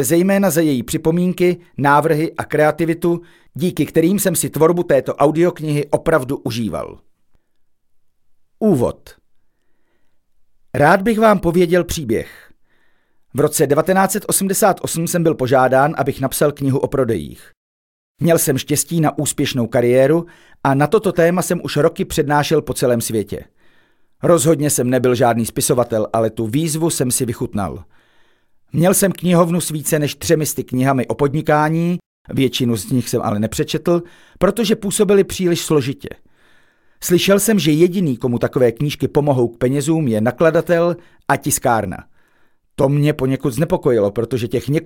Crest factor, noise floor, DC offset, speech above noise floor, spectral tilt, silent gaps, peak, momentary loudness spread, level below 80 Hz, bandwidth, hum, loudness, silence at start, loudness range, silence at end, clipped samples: 16 dB; -56 dBFS; under 0.1%; 40 dB; -5 dB/octave; 17.57-18.15 s, 32.06-32.25 s; 0 dBFS; 8 LU; -44 dBFS; 17 kHz; none; -17 LUFS; 0 s; 3 LU; 0 s; under 0.1%